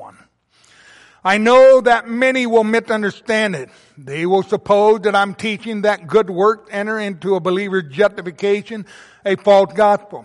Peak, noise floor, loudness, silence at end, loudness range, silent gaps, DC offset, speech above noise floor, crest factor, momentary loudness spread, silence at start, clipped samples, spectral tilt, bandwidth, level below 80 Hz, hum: -2 dBFS; -54 dBFS; -16 LUFS; 0.05 s; 4 LU; none; under 0.1%; 39 dB; 14 dB; 11 LU; 0 s; under 0.1%; -5.5 dB/octave; 11.5 kHz; -58 dBFS; none